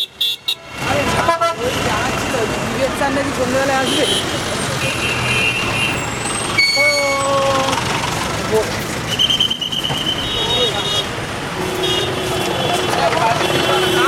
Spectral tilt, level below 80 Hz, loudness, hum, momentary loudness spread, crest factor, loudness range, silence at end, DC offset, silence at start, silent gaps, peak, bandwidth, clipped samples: -3 dB/octave; -38 dBFS; -16 LUFS; none; 6 LU; 16 dB; 2 LU; 0 s; under 0.1%; 0 s; none; 0 dBFS; 18 kHz; under 0.1%